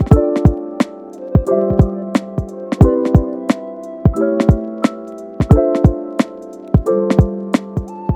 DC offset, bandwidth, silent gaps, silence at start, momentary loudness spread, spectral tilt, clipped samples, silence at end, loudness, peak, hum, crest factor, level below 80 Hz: under 0.1%; over 20 kHz; none; 0 s; 12 LU; -8.5 dB/octave; under 0.1%; 0 s; -16 LUFS; 0 dBFS; none; 14 dB; -24 dBFS